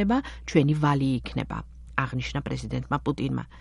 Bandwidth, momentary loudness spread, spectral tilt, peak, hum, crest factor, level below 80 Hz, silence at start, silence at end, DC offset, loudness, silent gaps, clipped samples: 11 kHz; 9 LU; -7 dB/octave; -4 dBFS; none; 22 dB; -42 dBFS; 0 s; 0 s; under 0.1%; -27 LUFS; none; under 0.1%